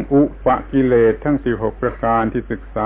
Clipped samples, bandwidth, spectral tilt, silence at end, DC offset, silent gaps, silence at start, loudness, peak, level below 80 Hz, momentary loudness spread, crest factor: under 0.1%; 3.8 kHz; -12 dB/octave; 0 s; under 0.1%; none; 0 s; -18 LUFS; -4 dBFS; -34 dBFS; 7 LU; 14 dB